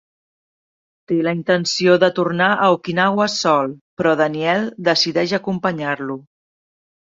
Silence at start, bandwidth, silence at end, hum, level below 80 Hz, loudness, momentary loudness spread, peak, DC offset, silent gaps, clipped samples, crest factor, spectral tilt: 1.1 s; 7.8 kHz; 0.85 s; none; -62 dBFS; -18 LUFS; 8 LU; -2 dBFS; under 0.1%; 3.81-3.97 s; under 0.1%; 18 dB; -4.5 dB/octave